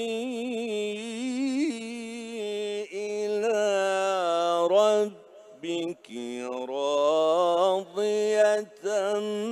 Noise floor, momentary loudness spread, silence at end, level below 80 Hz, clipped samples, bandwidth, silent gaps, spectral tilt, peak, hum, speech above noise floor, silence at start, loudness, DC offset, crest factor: -50 dBFS; 12 LU; 0 s; -84 dBFS; under 0.1%; 13.5 kHz; none; -3.5 dB/octave; -10 dBFS; none; 17 dB; 0 s; -27 LUFS; under 0.1%; 16 dB